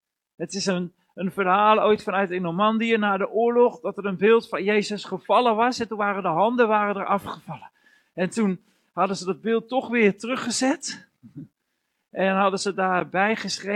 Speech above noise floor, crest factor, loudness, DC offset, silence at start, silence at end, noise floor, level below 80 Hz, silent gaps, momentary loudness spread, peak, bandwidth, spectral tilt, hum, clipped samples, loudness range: 54 dB; 18 dB; -23 LUFS; under 0.1%; 0.4 s; 0 s; -76 dBFS; -70 dBFS; none; 13 LU; -6 dBFS; 12.5 kHz; -4.5 dB/octave; none; under 0.1%; 4 LU